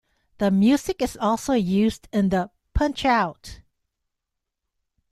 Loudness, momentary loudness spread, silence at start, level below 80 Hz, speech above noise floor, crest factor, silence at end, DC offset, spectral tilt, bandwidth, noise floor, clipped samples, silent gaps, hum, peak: -23 LUFS; 9 LU; 0.4 s; -38 dBFS; 61 dB; 18 dB; 1.55 s; under 0.1%; -6 dB/octave; 14 kHz; -82 dBFS; under 0.1%; none; none; -6 dBFS